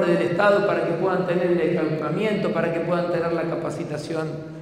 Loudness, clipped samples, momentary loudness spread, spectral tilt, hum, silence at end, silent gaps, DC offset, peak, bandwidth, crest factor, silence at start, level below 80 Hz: -23 LUFS; under 0.1%; 9 LU; -7 dB/octave; none; 0 s; none; under 0.1%; -6 dBFS; 11.5 kHz; 16 dB; 0 s; -60 dBFS